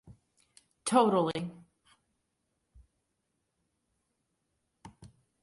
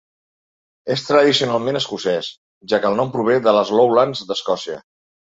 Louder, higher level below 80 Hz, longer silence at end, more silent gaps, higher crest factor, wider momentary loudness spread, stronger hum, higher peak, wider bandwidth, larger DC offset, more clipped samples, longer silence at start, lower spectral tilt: second, -29 LUFS vs -18 LUFS; second, -70 dBFS vs -62 dBFS; about the same, 0.35 s vs 0.4 s; second, none vs 2.38-2.61 s; first, 24 dB vs 18 dB; first, 14 LU vs 10 LU; neither; second, -12 dBFS vs -2 dBFS; first, 11.5 kHz vs 8 kHz; neither; neither; second, 0.1 s vs 0.85 s; about the same, -5 dB/octave vs -4.5 dB/octave